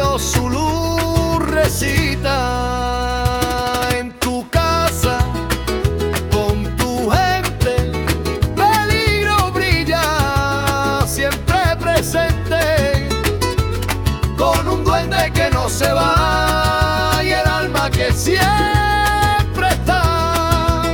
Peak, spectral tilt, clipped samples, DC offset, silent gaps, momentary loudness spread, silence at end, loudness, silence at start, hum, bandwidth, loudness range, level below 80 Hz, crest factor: -2 dBFS; -4.5 dB/octave; under 0.1%; under 0.1%; none; 5 LU; 0 s; -16 LUFS; 0 s; none; 18 kHz; 3 LU; -26 dBFS; 14 dB